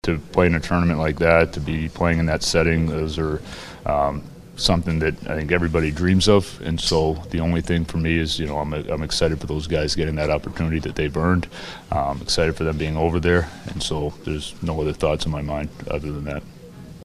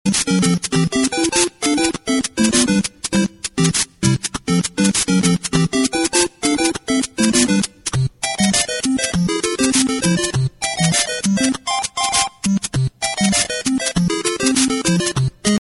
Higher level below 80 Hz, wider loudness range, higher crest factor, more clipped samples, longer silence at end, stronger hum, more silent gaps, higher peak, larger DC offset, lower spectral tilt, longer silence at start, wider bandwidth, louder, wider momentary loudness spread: first, -34 dBFS vs -42 dBFS; about the same, 3 LU vs 1 LU; first, 22 dB vs 16 dB; neither; about the same, 0 s vs 0.05 s; neither; neither; about the same, 0 dBFS vs 0 dBFS; neither; first, -5.5 dB/octave vs -3.5 dB/octave; about the same, 0.05 s vs 0.05 s; first, 13.5 kHz vs 12 kHz; second, -22 LUFS vs -17 LUFS; first, 10 LU vs 5 LU